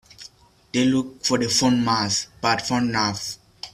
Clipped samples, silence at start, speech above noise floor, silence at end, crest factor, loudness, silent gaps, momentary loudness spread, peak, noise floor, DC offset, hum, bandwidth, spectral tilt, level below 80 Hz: under 0.1%; 0.2 s; 28 dB; 0.05 s; 18 dB; -21 LUFS; none; 13 LU; -6 dBFS; -49 dBFS; under 0.1%; none; 14.5 kHz; -3.5 dB/octave; -56 dBFS